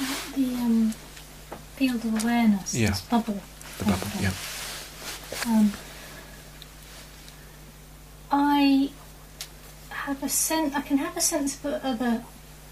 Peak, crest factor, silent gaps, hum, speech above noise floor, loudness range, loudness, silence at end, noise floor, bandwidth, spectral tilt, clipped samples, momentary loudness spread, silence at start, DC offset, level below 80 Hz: -8 dBFS; 20 dB; none; none; 21 dB; 5 LU; -26 LUFS; 0 s; -46 dBFS; 15.5 kHz; -4 dB/octave; under 0.1%; 22 LU; 0 s; under 0.1%; -50 dBFS